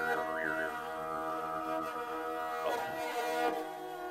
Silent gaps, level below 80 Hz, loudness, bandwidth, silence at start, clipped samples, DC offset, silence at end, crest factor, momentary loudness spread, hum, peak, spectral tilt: none; -70 dBFS; -36 LUFS; 16 kHz; 0 s; under 0.1%; under 0.1%; 0 s; 16 dB; 5 LU; none; -20 dBFS; -3.5 dB/octave